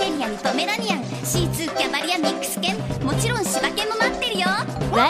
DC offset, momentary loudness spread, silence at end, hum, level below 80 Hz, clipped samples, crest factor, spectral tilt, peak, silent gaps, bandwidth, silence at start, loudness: under 0.1%; 3 LU; 0 s; none; -42 dBFS; under 0.1%; 20 dB; -3.5 dB/octave; -2 dBFS; none; 15.5 kHz; 0 s; -22 LUFS